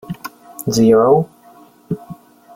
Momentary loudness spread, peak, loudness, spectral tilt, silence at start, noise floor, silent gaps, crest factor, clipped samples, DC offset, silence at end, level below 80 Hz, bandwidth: 19 LU; -2 dBFS; -14 LUFS; -6.5 dB/octave; 0.1 s; -46 dBFS; none; 16 dB; under 0.1%; under 0.1%; 0.4 s; -52 dBFS; 17 kHz